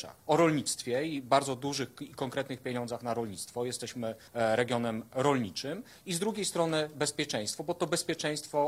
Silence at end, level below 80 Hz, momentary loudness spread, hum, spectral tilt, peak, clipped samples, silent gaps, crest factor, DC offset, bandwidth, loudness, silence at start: 0 s; -70 dBFS; 9 LU; none; -4 dB/octave; -12 dBFS; under 0.1%; none; 20 dB; under 0.1%; 16 kHz; -32 LUFS; 0 s